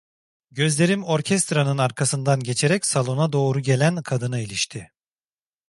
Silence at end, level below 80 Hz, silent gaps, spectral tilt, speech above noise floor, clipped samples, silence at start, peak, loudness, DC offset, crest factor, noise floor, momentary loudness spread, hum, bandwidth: 0.85 s; -62 dBFS; none; -4.5 dB/octave; over 69 dB; under 0.1%; 0.55 s; -4 dBFS; -21 LUFS; under 0.1%; 18 dB; under -90 dBFS; 6 LU; none; 11.5 kHz